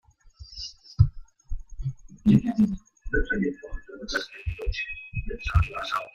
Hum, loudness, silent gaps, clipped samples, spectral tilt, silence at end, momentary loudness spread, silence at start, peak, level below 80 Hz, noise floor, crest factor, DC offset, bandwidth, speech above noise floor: none; -27 LUFS; none; under 0.1%; -7 dB/octave; 0.05 s; 19 LU; 0.25 s; -6 dBFS; -36 dBFS; -49 dBFS; 22 dB; under 0.1%; 7.8 kHz; 25 dB